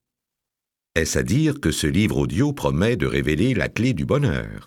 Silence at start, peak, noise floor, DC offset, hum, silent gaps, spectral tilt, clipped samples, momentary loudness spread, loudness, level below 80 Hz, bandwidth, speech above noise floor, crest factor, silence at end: 0.95 s; -4 dBFS; -86 dBFS; under 0.1%; none; none; -5.5 dB/octave; under 0.1%; 2 LU; -21 LUFS; -38 dBFS; 17 kHz; 66 dB; 18 dB; 0 s